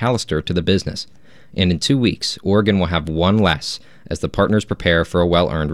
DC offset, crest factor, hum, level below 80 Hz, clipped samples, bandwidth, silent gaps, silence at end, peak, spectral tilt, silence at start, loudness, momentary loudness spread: 0.5%; 16 dB; none; -40 dBFS; under 0.1%; 12.5 kHz; none; 0 s; -2 dBFS; -5.5 dB/octave; 0 s; -18 LUFS; 11 LU